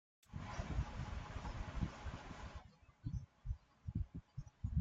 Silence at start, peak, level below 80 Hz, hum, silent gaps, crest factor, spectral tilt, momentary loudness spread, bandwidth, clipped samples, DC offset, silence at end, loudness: 0.3 s; -26 dBFS; -50 dBFS; none; none; 20 dB; -6.5 dB/octave; 10 LU; 7.8 kHz; under 0.1%; under 0.1%; 0 s; -48 LUFS